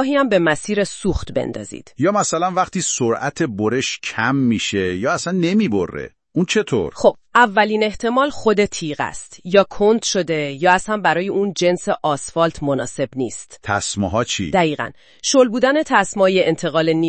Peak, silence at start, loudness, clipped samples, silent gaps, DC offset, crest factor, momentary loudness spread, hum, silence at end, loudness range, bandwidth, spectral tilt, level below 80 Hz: 0 dBFS; 0 s; -18 LUFS; under 0.1%; none; 0.3%; 18 dB; 9 LU; none; 0 s; 3 LU; 8.8 kHz; -4.5 dB/octave; -44 dBFS